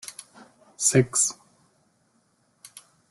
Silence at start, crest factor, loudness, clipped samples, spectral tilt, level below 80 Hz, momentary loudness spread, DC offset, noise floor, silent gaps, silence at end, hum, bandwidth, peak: 0.05 s; 24 dB; -22 LUFS; under 0.1%; -3.5 dB/octave; -66 dBFS; 27 LU; under 0.1%; -67 dBFS; none; 1.8 s; none; 12.5 kHz; -6 dBFS